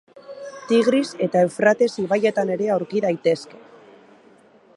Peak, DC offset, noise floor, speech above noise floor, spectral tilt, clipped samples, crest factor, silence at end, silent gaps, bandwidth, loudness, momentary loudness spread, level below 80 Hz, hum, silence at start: -4 dBFS; under 0.1%; -52 dBFS; 32 dB; -5.5 dB/octave; under 0.1%; 16 dB; 1.2 s; none; 11.5 kHz; -20 LUFS; 19 LU; -72 dBFS; none; 0.3 s